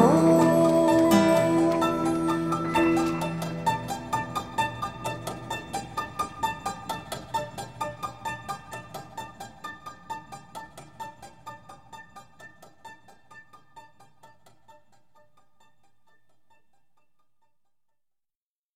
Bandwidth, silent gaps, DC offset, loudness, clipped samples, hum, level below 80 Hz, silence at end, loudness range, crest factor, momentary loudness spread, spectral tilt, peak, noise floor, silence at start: 16 kHz; none; 0.2%; -26 LUFS; under 0.1%; none; -56 dBFS; 4.95 s; 23 LU; 22 dB; 25 LU; -6 dB/octave; -6 dBFS; under -90 dBFS; 0 s